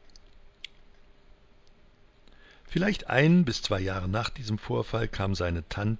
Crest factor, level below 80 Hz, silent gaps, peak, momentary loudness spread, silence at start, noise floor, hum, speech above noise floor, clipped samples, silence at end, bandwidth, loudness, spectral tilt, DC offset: 20 dB; -44 dBFS; none; -10 dBFS; 18 LU; 0.15 s; -57 dBFS; none; 30 dB; under 0.1%; 0 s; 7.8 kHz; -28 LUFS; -6.5 dB/octave; under 0.1%